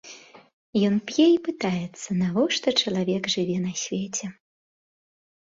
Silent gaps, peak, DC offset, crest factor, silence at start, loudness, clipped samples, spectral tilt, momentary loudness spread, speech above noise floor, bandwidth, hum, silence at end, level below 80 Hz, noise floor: 0.53-0.73 s; -8 dBFS; under 0.1%; 18 dB; 0.05 s; -24 LUFS; under 0.1%; -4.5 dB/octave; 10 LU; 23 dB; 7.8 kHz; none; 1.25 s; -64 dBFS; -47 dBFS